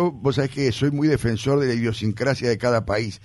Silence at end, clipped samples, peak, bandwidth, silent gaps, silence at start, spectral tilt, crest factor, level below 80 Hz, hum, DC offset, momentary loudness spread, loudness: 0.05 s; under 0.1%; -6 dBFS; 11.5 kHz; none; 0 s; -6.5 dB/octave; 14 dB; -46 dBFS; none; under 0.1%; 3 LU; -22 LUFS